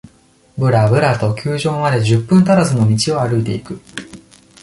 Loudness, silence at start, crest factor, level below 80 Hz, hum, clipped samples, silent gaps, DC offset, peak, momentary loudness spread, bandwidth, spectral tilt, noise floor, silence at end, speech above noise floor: -15 LUFS; 0.55 s; 14 dB; -46 dBFS; none; under 0.1%; none; under 0.1%; -2 dBFS; 17 LU; 11.5 kHz; -6.5 dB/octave; -51 dBFS; 0.45 s; 37 dB